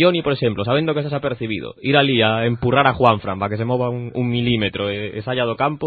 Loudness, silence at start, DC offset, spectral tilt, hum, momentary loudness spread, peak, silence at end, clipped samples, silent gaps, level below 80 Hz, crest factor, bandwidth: -19 LUFS; 0 s; under 0.1%; -9 dB/octave; none; 8 LU; 0 dBFS; 0 s; under 0.1%; none; -48 dBFS; 18 dB; 4.8 kHz